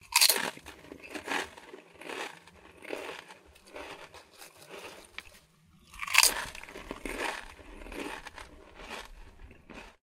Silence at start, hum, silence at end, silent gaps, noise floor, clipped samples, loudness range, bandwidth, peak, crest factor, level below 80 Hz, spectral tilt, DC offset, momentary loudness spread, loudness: 0.05 s; none; 0.1 s; none; -62 dBFS; under 0.1%; 15 LU; 16 kHz; -2 dBFS; 34 dB; -56 dBFS; 0.5 dB/octave; under 0.1%; 27 LU; -30 LUFS